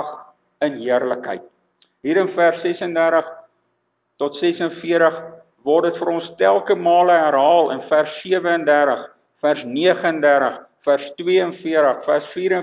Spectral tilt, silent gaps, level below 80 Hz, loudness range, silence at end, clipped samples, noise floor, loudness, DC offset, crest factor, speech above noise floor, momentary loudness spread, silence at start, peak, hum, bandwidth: -9 dB/octave; none; -72 dBFS; 5 LU; 0 s; under 0.1%; -70 dBFS; -18 LUFS; under 0.1%; 16 dB; 52 dB; 11 LU; 0 s; -2 dBFS; none; 4 kHz